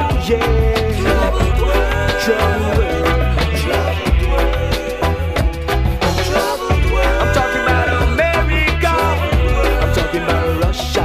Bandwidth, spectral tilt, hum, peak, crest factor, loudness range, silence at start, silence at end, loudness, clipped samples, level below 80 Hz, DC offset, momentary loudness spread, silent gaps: 16 kHz; -5.5 dB/octave; none; -2 dBFS; 14 dB; 2 LU; 0 s; 0 s; -16 LUFS; under 0.1%; -18 dBFS; under 0.1%; 3 LU; none